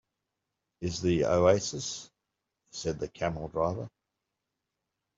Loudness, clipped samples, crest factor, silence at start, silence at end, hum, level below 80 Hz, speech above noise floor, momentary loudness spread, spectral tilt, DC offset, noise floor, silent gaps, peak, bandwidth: -30 LUFS; under 0.1%; 22 dB; 0.8 s; 1.3 s; none; -58 dBFS; 57 dB; 16 LU; -5 dB/octave; under 0.1%; -86 dBFS; none; -10 dBFS; 8 kHz